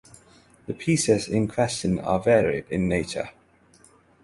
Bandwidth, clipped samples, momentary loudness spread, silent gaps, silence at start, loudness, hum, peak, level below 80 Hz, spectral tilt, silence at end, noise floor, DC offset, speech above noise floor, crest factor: 11.5 kHz; under 0.1%; 13 LU; none; 0.7 s; -24 LUFS; none; -6 dBFS; -48 dBFS; -5 dB/octave; 0.95 s; -57 dBFS; under 0.1%; 33 dB; 20 dB